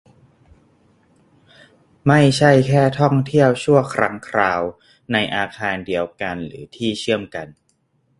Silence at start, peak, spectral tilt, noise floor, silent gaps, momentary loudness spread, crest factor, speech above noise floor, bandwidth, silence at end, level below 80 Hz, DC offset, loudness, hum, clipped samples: 2.05 s; 0 dBFS; -6 dB/octave; -64 dBFS; none; 13 LU; 20 dB; 47 dB; 11.5 kHz; 0.7 s; -52 dBFS; under 0.1%; -18 LUFS; none; under 0.1%